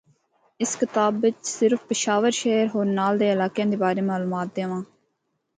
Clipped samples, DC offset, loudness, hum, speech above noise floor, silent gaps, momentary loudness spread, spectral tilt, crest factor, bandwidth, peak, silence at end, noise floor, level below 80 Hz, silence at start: under 0.1%; under 0.1%; -23 LUFS; none; 52 dB; none; 7 LU; -4.5 dB/octave; 16 dB; 9.6 kHz; -8 dBFS; 0.75 s; -75 dBFS; -72 dBFS; 0.6 s